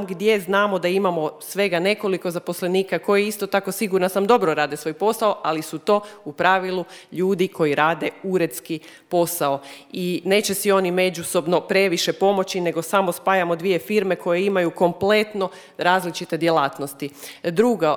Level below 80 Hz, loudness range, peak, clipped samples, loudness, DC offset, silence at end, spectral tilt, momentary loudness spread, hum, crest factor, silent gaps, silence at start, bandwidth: -68 dBFS; 2 LU; -2 dBFS; under 0.1%; -21 LUFS; under 0.1%; 0 s; -4.5 dB/octave; 8 LU; none; 20 dB; none; 0 s; over 20 kHz